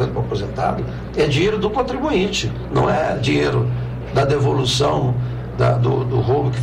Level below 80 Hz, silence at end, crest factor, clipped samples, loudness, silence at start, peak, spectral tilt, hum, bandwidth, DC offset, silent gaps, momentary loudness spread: -34 dBFS; 0 s; 12 dB; under 0.1%; -19 LUFS; 0 s; -8 dBFS; -6 dB/octave; none; 10.5 kHz; under 0.1%; none; 6 LU